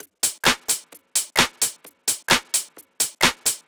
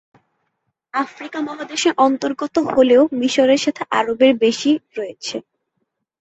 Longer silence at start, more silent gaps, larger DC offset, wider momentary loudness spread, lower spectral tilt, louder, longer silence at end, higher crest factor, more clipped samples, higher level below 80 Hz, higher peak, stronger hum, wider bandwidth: second, 0.25 s vs 0.95 s; neither; neither; second, 6 LU vs 13 LU; second, -0.5 dB/octave vs -3.5 dB/octave; second, -21 LUFS vs -18 LUFS; second, 0.1 s vs 0.8 s; first, 22 dB vs 16 dB; neither; first, -54 dBFS vs -60 dBFS; about the same, -2 dBFS vs -2 dBFS; neither; first, over 20 kHz vs 8.2 kHz